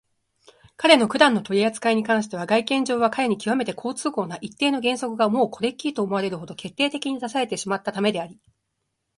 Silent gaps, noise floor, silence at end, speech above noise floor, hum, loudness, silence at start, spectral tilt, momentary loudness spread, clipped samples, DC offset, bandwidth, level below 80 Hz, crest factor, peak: none; -77 dBFS; 0.85 s; 55 dB; none; -22 LUFS; 0.8 s; -4 dB/octave; 10 LU; under 0.1%; under 0.1%; 11.5 kHz; -68 dBFS; 22 dB; 0 dBFS